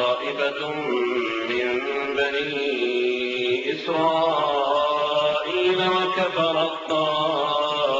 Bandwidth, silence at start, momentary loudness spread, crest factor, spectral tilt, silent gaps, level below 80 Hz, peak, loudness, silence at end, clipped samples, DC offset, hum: 7.8 kHz; 0 s; 4 LU; 14 dB; -4.5 dB/octave; none; -62 dBFS; -8 dBFS; -23 LUFS; 0 s; under 0.1%; under 0.1%; none